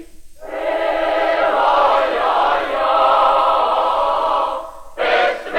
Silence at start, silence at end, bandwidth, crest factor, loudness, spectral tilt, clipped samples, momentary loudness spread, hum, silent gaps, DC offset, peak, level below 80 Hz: 0 s; 0 s; 15.5 kHz; 12 dB; -16 LUFS; -3 dB/octave; under 0.1%; 9 LU; none; none; under 0.1%; -4 dBFS; -46 dBFS